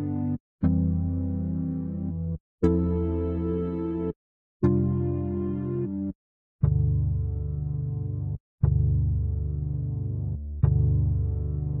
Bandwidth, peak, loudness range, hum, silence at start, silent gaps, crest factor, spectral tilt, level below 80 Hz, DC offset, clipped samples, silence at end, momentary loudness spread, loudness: 3.2 kHz; -6 dBFS; 2 LU; none; 0 s; 0.40-0.59 s, 2.40-2.58 s, 4.16-4.60 s, 6.15-6.59 s, 8.40-8.58 s; 20 dB; -12.5 dB/octave; -34 dBFS; under 0.1%; under 0.1%; 0 s; 8 LU; -28 LUFS